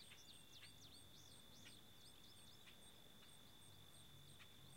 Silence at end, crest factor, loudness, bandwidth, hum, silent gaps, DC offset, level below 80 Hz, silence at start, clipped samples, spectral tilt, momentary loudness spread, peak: 0 s; 16 dB; -63 LUFS; 16 kHz; none; none; under 0.1%; -80 dBFS; 0 s; under 0.1%; -2.5 dB/octave; 3 LU; -48 dBFS